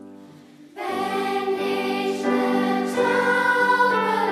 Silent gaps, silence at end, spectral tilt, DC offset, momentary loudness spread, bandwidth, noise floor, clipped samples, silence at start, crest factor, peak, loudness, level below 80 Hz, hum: none; 0 s; -4.5 dB/octave; under 0.1%; 7 LU; 15.5 kHz; -46 dBFS; under 0.1%; 0 s; 14 dB; -8 dBFS; -21 LUFS; -78 dBFS; none